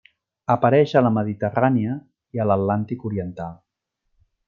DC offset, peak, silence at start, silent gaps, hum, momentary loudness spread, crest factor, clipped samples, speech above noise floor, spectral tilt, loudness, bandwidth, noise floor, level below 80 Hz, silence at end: under 0.1%; -2 dBFS; 0.5 s; none; none; 16 LU; 20 dB; under 0.1%; 55 dB; -9 dB/octave; -21 LUFS; 7 kHz; -75 dBFS; -60 dBFS; 0.95 s